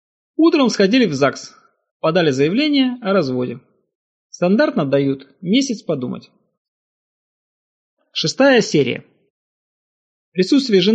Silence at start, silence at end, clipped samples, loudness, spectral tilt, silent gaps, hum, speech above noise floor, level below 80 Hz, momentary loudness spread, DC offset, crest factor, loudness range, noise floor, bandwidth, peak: 0.4 s; 0 s; under 0.1%; -17 LUFS; -5 dB/octave; 1.91-2.00 s, 3.95-4.30 s, 6.58-7.97 s, 9.30-10.32 s; none; over 74 dB; -66 dBFS; 13 LU; under 0.1%; 18 dB; 5 LU; under -90 dBFS; 8.6 kHz; -2 dBFS